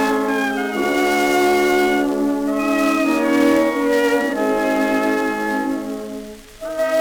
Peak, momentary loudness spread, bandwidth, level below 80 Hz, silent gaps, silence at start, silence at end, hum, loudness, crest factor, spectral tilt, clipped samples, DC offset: -4 dBFS; 11 LU; over 20 kHz; -48 dBFS; none; 0 s; 0 s; none; -18 LUFS; 14 dB; -4 dB/octave; under 0.1%; under 0.1%